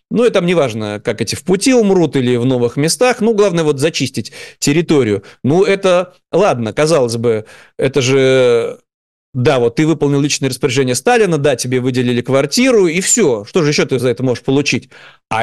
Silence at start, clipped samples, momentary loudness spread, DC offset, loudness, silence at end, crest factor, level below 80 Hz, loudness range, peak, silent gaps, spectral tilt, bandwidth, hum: 0.1 s; under 0.1%; 7 LU; 0.3%; -13 LUFS; 0 s; 10 dB; -50 dBFS; 2 LU; -4 dBFS; 8.94-9.33 s; -5 dB/octave; 12.5 kHz; none